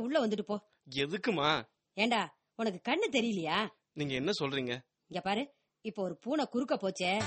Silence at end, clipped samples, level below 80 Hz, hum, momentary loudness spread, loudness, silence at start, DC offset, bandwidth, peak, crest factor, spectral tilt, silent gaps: 0 s; under 0.1%; -72 dBFS; none; 10 LU; -34 LUFS; 0 s; under 0.1%; 8.4 kHz; -16 dBFS; 18 dB; -4.5 dB/octave; none